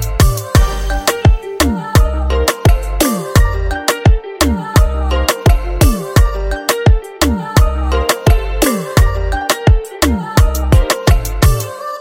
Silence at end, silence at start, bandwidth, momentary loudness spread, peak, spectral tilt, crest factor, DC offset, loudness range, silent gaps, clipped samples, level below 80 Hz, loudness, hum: 0 s; 0 s; 17 kHz; 4 LU; 0 dBFS; -5 dB/octave; 12 dB; under 0.1%; 1 LU; none; under 0.1%; -16 dBFS; -14 LUFS; none